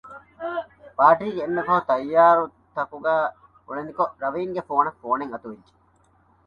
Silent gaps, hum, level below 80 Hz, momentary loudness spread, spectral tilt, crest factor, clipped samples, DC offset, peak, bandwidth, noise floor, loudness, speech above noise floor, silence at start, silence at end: none; none; -64 dBFS; 17 LU; -7.5 dB/octave; 20 dB; under 0.1%; under 0.1%; -2 dBFS; 5.4 kHz; -60 dBFS; -22 LUFS; 39 dB; 0.05 s; 0.9 s